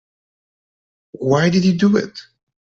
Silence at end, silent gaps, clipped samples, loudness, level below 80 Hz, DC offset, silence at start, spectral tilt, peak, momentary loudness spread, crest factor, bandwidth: 0.5 s; none; under 0.1%; -16 LUFS; -56 dBFS; under 0.1%; 1.2 s; -6.5 dB/octave; -2 dBFS; 10 LU; 16 dB; 7.6 kHz